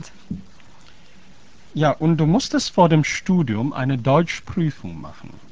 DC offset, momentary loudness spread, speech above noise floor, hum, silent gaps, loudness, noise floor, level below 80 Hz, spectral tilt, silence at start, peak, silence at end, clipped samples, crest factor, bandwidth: 1%; 19 LU; 31 dB; none; none; -19 LUFS; -50 dBFS; -48 dBFS; -6 dB/octave; 0 s; -2 dBFS; 0.25 s; under 0.1%; 20 dB; 8 kHz